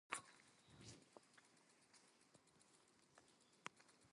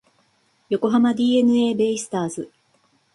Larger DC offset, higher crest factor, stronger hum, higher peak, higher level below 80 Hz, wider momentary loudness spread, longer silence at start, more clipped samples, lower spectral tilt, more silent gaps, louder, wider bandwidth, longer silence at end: neither; first, 38 dB vs 14 dB; neither; second, -24 dBFS vs -8 dBFS; second, -90 dBFS vs -66 dBFS; first, 16 LU vs 12 LU; second, 0.1 s vs 0.7 s; neither; second, -2 dB/octave vs -5 dB/octave; neither; second, -59 LUFS vs -20 LUFS; about the same, 11.5 kHz vs 11.5 kHz; second, 0 s vs 0.7 s